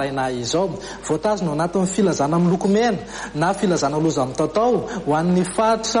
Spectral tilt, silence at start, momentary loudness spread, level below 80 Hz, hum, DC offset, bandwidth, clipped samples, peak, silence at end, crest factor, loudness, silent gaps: -5.5 dB/octave; 0 s; 5 LU; -48 dBFS; none; under 0.1%; 10.5 kHz; under 0.1%; -6 dBFS; 0 s; 14 dB; -20 LUFS; none